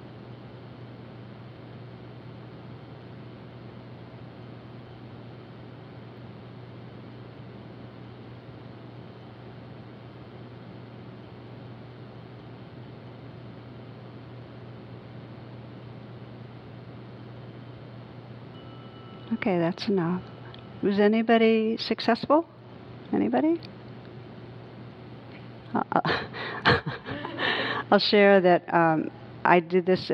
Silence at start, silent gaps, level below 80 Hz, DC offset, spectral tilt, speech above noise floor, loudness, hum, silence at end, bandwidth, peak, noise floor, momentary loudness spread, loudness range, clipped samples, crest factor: 0 s; none; -62 dBFS; under 0.1%; -7.5 dB/octave; 22 dB; -24 LUFS; none; 0 s; 6.6 kHz; -2 dBFS; -44 dBFS; 22 LU; 21 LU; under 0.1%; 26 dB